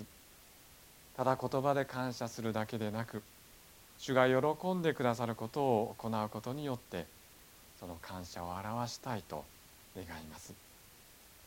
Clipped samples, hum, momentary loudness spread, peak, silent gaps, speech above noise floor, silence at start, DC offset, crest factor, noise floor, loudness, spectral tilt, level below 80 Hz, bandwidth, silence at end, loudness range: under 0.1%; none; 24 LU; -12 dBFS; none; 23 dB; 0 s; under 0.1%; 24 dB; -59 dBFS; -36 LUFS; -5.5 dB/octave; -66 dBFS; 17 kHz; 0 s; 10 LU